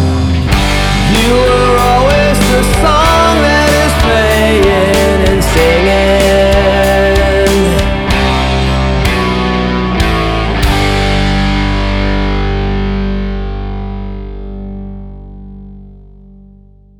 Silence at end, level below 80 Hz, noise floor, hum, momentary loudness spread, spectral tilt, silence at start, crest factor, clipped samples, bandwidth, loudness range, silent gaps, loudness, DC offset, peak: 1 s; -16 dBFS; -40 dBFS; 50 Hz at -35 dBFS; 13 LU; -5 dB/octave; 0 s; 10 dB; under 0.1%; 19 kHz; 11 LU; none; -10 LUFS; under 0.1%; 0 dBFS